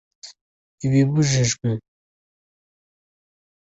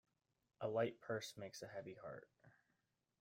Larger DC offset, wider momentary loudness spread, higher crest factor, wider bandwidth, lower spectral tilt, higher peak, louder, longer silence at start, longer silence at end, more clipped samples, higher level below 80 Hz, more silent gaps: neither; second, 10 LU vs 13 LU; about the same, 18 dB vs 22 dB; second, 8.2 kHz vs 16 kHz; about the same, -5.5 dB/octave vs -5 dB/octave; first, -6 dBFS vs -28 dBFS; first, -21 LUFS vs -47 LUFS; second, 0.25 s vs 0.6 s; first, 1.8 s vs 0.7 s; neither; first, -54 dBFS vs -86 dBFS; first, 0.41-0.78 s vs none